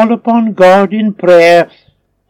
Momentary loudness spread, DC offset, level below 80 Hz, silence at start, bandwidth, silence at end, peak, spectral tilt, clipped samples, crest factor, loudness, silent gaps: 8 LU; under 0.1%; -54 dBFS; 0 s; 12.5 kHz; 0.65 s; 0 dBFS; -6 dB/octave; 2%; 8 dB; -8 LUFS; none